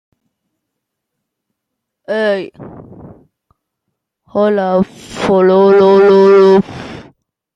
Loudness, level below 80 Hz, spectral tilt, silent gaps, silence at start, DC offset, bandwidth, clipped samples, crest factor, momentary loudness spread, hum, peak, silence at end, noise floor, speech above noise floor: -11 LUFS; -52 dBFS; -7 dB/octave; none; 2.1 s; under 0.1%; 7.8 kHz; under 0.1%; 12 dB; 16 LU; none; -2 dBFS; 0.55 s; -76 dBFS; 67 dB